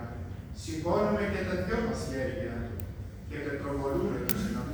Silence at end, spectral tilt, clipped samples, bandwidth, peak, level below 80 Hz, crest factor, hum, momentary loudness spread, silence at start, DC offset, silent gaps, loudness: 0 s; -6 dB/octave; under 0.1%; over 20 kHz; -8 dBFS; -44 dBFS; 24 dB; none; 12 LU; 0 s; under 0.1%; none; -32 LUFS